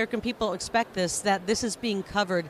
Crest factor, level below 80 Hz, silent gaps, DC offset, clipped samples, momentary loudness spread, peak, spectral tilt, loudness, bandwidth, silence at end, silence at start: 16 dB; -54 dBFS; none; under 0.1%; under 0.1%; 4 LU; -12 dBFS; -3.5 dB/octave; -28 LUFS; 15.5 kHz; 0 s; 0 s